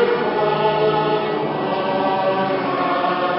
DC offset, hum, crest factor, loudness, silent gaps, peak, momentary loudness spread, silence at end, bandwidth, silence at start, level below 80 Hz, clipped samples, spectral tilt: under 0.1%; none; 14 dB; -19 LUFS; none; -4 dBFS; 4 LU; 0 s; 5.8 kHz; 0 s; -58 dBFS; under 0.1%; -10.5 dB/octave